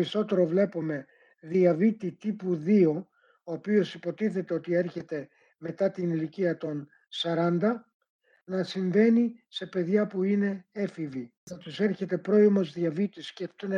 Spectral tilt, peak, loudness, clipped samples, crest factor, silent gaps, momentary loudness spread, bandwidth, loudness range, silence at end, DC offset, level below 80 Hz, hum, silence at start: -7.5 dB/octave; -10 dBFS; -28 LUFS; under 0.1%; 16 dB; 7.94-8.00 s, 8.09-8.19 s, 11.37-11.47 s; 15 LU; 7.6 kHz; 4 LU; 0 s; under 0.1%; -78 dBFS; none; 0 s